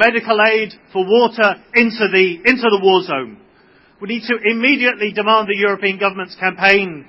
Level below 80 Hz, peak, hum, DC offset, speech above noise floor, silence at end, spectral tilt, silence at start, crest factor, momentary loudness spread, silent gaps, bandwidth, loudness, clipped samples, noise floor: -60 dBFS; 0 dBFS; none; under 0.1%; 35 dB; 0.05 s; -6 dB/octave; 0 s; 16 dB; 10 LU; none; 8 kHz; -15 LUFS; under 0.1%; -50 dBFS